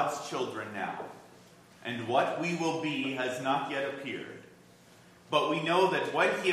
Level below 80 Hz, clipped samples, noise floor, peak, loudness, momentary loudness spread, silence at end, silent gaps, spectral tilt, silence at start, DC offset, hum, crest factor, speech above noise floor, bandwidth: -78 dBFS; under 0.1%; -57 dBFS; -12 dBFS; -31 LUFS; 15 LU; 0 s; none; -4.5 dB/octave; 0 s; under 0.1%; none; 20 dB; 26 dB; 14.5 kHz